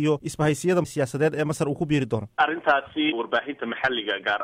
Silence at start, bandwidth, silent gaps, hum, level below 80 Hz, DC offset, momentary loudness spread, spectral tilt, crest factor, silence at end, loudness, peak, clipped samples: 0 s; 16 kHz; none; none; -56 dBFS; under 0.1%; 4 LU; -5.5 dB/octave; 18 dB; 0 s; -24 LUFS; -8 dBFS; under 0.1%